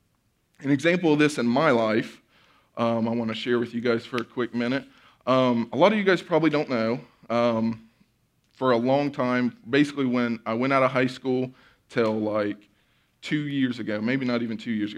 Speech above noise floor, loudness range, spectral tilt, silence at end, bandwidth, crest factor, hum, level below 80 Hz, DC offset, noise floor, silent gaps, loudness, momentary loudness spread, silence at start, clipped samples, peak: 45 dB; 4 LU; -6.5 dB/octave; 0 s; 11.5 kHz; 20 dB; none; -70 dBFS; under 0.1%; -69 dBFS; none; -25 LUFS; 9 LU; 0.6 s; under 0.1%; -6 dBFS